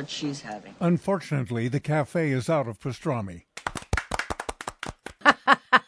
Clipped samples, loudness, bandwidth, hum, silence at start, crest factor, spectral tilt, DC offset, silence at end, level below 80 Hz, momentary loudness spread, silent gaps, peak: under 0.1%; -26 LUFS; 11 kHz; none; 0 s; 26 dB; -5.5 dB/octave; under 0.1%; 0.05 s; -46 dBFS; 15 LU; none; 0 dBFS